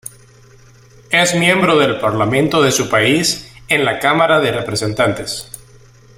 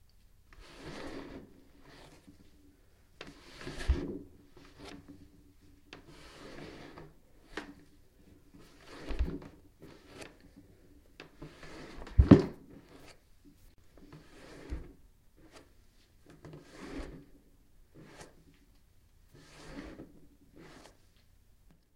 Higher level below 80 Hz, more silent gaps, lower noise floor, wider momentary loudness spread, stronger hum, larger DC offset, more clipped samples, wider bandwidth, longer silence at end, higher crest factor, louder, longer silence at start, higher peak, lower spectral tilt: about the same, -48 dBFS vs -44 dBFS; neither; second, -44 dBFS vs -63 dBFS; second, 11 LU vs 22 LU; neither; neither; neither; first, 16.5 kHz vs 12.5 kHz; second, 0.6 s vs 1.2 s; second, 16 dB vs 36 dB; first, -14 LUFS vs -33 LUFS; first, 1.1 s vs 0.55 s; about the same, 0 dBFS vs -2 dBFS; second, -4 dB/octave vs -8 dB/octave